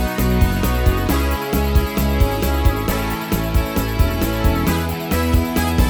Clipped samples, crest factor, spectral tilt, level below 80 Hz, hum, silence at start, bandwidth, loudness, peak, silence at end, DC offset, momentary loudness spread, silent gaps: under 0.1%; 14 dB; -6 dB/octave; -20 dBFS; none; 0 s; over 20 kHz; -19 LUFS; -2 dBFS; 0 s; under 0.1%; 3 LU; none